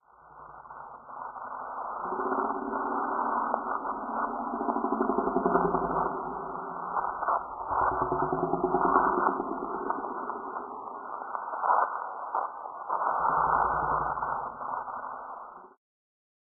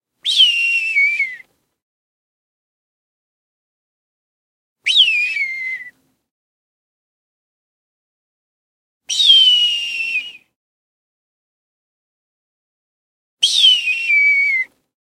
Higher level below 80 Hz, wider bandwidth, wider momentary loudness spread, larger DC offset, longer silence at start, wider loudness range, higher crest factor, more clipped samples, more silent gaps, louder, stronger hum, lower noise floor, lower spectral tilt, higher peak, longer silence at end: first, -56 dBFS vs -80 dBFS; second, 1.7 kHz vs 16 kHz; about the same, 13 LU vs 14 LU; neither; about the same, 0.25 s vs 0.25 s; second, 4 LU vs 13 LU; about the same, 24 dB vs 20 dB; neither; second, none vs 1.82-4.76 s, 6.31-9.01 s, 10.56-13.37 s; second, -30 LUFS vs -12 LUFS; neither; first, -51 dBFS vs -42 dBFS; first, -1 dB/octave vs 5 dB/octave; second, -8 dBFS vs 0 dBFS; first, 0.75 s vs 0.4 s